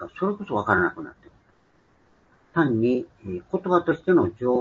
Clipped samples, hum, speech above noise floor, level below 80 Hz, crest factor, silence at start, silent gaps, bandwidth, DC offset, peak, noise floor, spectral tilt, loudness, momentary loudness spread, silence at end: under 0.1%; none; 38 dB; -58 dBFS; 22 dB; 0 s; none; 7 kHz; under 0.1%; -4 dBFS; -62 dBFS; -9 dB/octave; -24 LUFS; 13 LU; 0 s